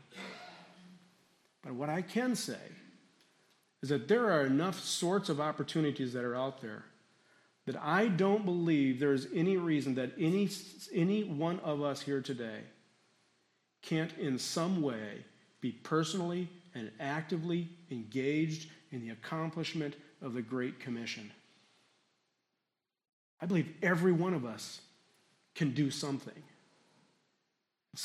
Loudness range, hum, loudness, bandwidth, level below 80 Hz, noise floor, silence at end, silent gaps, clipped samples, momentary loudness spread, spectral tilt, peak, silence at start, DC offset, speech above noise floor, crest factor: 8 LU; none; -34 LUFS; 14 kHz; -82 dBFS; -88 dBFS; 0 s; 23.13-23.37 s; under 0.1%; 16 LU; -5.5 dB/octave; -16 dBFS; 0.1 s; under 0.1%; 54 dB; 20 dB